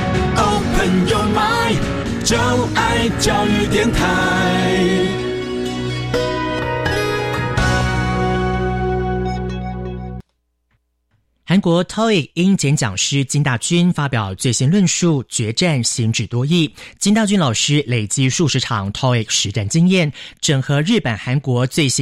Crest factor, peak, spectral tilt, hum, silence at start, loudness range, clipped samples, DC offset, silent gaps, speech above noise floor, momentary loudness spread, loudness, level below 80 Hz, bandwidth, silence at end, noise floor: 12 dB; -4 dBFS; -4.5 dB/octave; none; 0 s; 4 LU; under 0.1%; under 0.1%; none; 51 dB; 6 LU; -17 LUFS; -32 dBFS; 15.5 kHz; 0 s; -68 dBFS